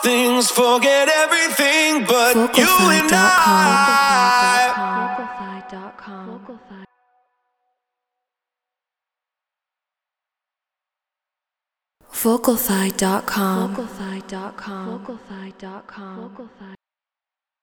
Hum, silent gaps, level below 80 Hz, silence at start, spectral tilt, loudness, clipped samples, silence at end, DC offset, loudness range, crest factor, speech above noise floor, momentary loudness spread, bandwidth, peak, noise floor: none; none; -56 dBFS; 0 s; -3 dB/octave; -15 LUFS; under 0.1%; 0.85 s; under 0.1%; 20 LU; 20 dB; 72 dB; 23 LU; over 20 kHz; 0 dBFS; -90 dBFS